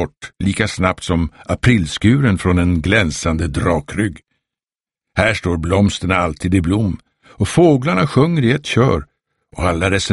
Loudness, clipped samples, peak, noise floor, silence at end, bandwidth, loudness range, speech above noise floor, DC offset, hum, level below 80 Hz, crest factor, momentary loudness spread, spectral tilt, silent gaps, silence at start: -16 LUFS; under 0.1%; 0 dBFS; under -90 dBFS; 0 s; 11.5 kHz; 3 LU; over 74 dB; under 0.1%; none; -34 dBFS; 16 dB; 8 LU; -6 dB/octave; none; 0 s